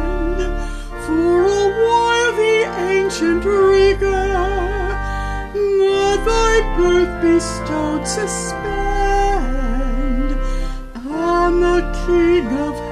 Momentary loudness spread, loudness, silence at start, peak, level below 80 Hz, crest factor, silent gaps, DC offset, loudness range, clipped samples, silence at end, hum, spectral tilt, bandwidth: 9 LU; -17 LUFS; 0 s; -2 dBFS; -24 dBFS; 14 dB; none; under 0.1%; 5 LU; under 0.1%; 0 s; none; -5 dB/octave; 12.5 kHz